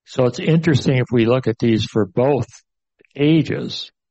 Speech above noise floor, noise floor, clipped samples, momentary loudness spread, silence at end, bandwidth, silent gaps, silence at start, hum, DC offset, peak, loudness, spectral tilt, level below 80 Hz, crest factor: 42 dB; -59 dBFS; under 0.1%; 8 LU; 0.25 s; 8.2 kHz; none; 0.1 s; none; under 0.1%; -2 dBFS; -18 LUFS; -7 dB/octave; -52 dBFS; 16 dB